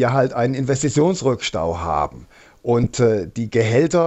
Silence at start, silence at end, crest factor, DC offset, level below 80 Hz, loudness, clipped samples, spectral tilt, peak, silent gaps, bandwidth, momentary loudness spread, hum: 0 s; 0 s; 16 dB; under 0.1%; -44 dBFS; -19 LUFS; under 0.1%; -6 dB/octave; -4 dBFS; none; 8.4 kHz; 6 LU; none